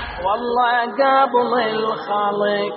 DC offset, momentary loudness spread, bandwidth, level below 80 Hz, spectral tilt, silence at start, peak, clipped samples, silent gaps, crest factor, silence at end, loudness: under 0.1%; 6 LU; 5.8 kHz; -46 dBFS; -1.5 dB/octave; 0 s; -4 dBFS; under 0.1%; none; 16 dB; 0 s; -18 LUFS